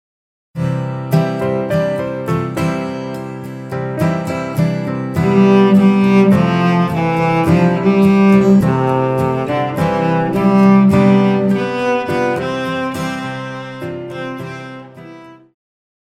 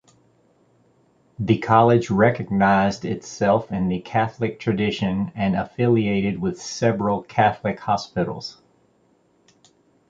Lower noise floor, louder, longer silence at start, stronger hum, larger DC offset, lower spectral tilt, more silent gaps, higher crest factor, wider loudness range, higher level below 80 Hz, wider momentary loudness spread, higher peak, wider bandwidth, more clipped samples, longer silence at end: second, -37 dBFS vs -61 dBFS; first, -14 LUFS vs -21 LUFS; second, 0.55 s vs 1.4 s; neither; neither; first, -8 dB/octave vs -6.5 dB/octave; neither; second, 14 dB vs 20 dB; first, 8 LU vs 5 LU; about the same, -48 dBFS vs -50 dBFS; first, 15 LU vs 9 LU; about the same, 0 dBFS vs -2 dBFS; first, 14 kHz vs 7.8 kHz; neither; second, 0.7 s vs 1.55 s